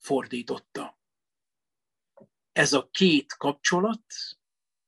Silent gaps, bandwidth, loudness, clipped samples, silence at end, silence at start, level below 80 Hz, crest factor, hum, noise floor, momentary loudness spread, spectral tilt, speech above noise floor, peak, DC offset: none; 12 kHz; -26 LUFS; under 0.1%; 0.55 s; 0.05 s; -72 dBFS; 20 dB; none; under -90 dBFS; 17 LU; -3.5 dB/octave; over 64 dB; -8 dBFS; under 0.1%